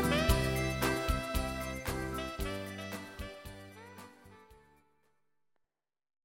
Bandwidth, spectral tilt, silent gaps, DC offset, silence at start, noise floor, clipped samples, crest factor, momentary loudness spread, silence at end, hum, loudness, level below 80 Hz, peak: 17 kHz; -5 dB/octave; none; under 0.1%; 0 s; -86 dBFS; under 0.1%; 24 dB; 21 LU; 1.7 s; none; -35 LUFS; -44 dBFS; -14 dBFS